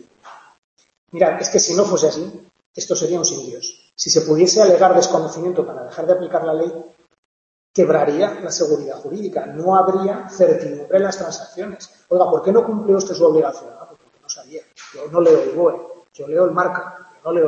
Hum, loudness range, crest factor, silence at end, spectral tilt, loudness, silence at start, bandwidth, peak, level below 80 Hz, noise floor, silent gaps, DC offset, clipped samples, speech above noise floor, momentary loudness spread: none; 4 LU; 16 dB; 0 s; -4 dB/octave; -17 LUFS; 0.25 s; 8.2 kHz; -2 dBFS; -68 dBFS; -44 dBFS; 0.58-0.77 s, 0.98-1.07 s, 2.66-2.74 s, 7.18-7.74 s; under 0.1%; under 0.1%; 27 dB; 17 LU